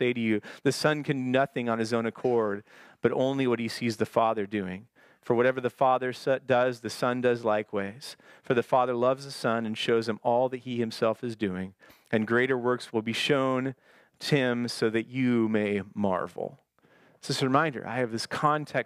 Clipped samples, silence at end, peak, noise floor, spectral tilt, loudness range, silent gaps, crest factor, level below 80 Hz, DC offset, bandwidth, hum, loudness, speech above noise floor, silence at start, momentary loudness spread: under 0.1%; 0 s; -8 dBFS; -62 dBFS; -5.5 dB/octave; 2 LU; none; 20 dB; -74 dBFS; under 0.1%; 15.5 kHz; none; -28 LUFS; 34 dB; 0 s; 8 LU